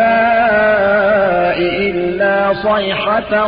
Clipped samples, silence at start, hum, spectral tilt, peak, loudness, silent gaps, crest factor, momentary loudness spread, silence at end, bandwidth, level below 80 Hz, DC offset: under 0.1%; 0 s; none; -10.5 dB/octave; -2 dBFS; -13 LUFS; none; 10 dB; 4 LU; 0 s; 5.2 kHz; -42 dBFS; under 0.1%